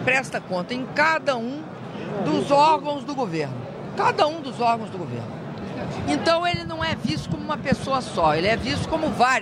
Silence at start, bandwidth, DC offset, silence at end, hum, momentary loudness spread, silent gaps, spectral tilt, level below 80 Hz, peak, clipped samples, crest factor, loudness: 0 s; 13.5 kHz; under 0.1%; 0 s; none; 12 LU; none; -5 dB/octave; -48 dBFS; -4 dBFS; under 0.1%; 20 dB; -23 LUFS